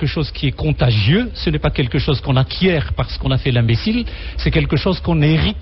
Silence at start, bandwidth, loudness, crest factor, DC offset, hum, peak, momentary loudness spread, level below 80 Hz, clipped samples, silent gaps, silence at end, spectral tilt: 0 s; 6 kHz; -17 LUFS; 12 dB; under 0.1%; none; -4 dBFS; 6 LU; -26 dBFS; under 0.1%; none; 0 s; -9 dB/octave